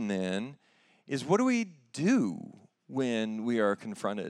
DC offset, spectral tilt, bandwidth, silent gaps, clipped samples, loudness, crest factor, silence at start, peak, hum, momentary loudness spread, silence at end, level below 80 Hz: under 0.1%; -5.5 dB/octave; 11.5 kHz; none; under 0.1%; -31 LUFS; 18 dB; 0 s; -12 dBFS; none; 12 LU; 0 s; -84 dBFS